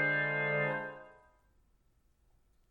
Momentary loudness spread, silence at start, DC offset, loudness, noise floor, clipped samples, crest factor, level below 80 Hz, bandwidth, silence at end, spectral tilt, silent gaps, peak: 16 LU; 0 s; under 0.1%; -32 LUFS; -71 dBFS; under 0.1%; 16 dB; -72 dBFS; 4.7 kHz; 1.6 s; -8 dB/octave; none; -20 dBFS